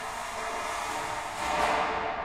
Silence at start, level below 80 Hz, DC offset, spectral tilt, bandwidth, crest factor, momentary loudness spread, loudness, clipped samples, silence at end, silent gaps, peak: 0 s; -52 dBFS; under 0.1%; -2.5 dB/octave; 16 kHz; 18 dB; 7 LU; -30 LUFS; under 0.1%; 0 s; none; -12 dBFS